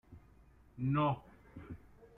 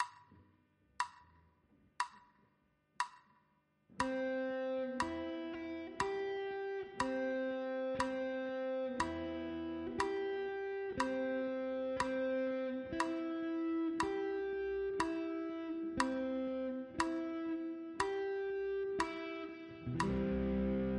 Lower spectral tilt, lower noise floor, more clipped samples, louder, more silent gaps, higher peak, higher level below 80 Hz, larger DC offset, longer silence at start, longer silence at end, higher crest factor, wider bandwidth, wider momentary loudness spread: first, -10 dB/octave vs -5.5 dB/octave; second, -63 dBFS vs -76 dBFS; neither; first, -36 LUFS vs -39 LUFS; neither; second, -22 dBFS vs -16 dBFS; about the same, -62 dBFS vs -60 dBFS; neither; about the same, 0.1 s vs 0 s; first, 0.15 s vs 0 s; second, 16 dB vs 24 dB; second, 3.9 kHz vs 10.5 kHz; first, 23 LU vs 6 LU